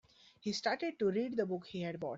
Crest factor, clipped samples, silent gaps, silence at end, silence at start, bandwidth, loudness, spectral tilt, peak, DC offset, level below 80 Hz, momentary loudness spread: 18 dB; under 0.1%; none; 0 s; 0.45 s; 8 kHz; -37 LUFS; -4 dB/octave; -20 dBFS; under 0.1%; -76 dBFS; 6 LU